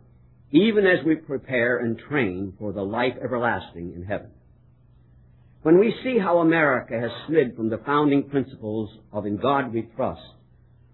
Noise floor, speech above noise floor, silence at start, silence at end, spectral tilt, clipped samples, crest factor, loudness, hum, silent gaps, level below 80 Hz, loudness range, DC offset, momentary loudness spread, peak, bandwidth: -55 dBFS; 32 dB; 0.5 s; 0.65 s; -10.5 dB/octave; under 0.1%; 18 dB; -23 LUFS; none; none; -58 dBFS; 7 LU; under 0.1%; 13 LU; -6 dBFS; 4.2 kHz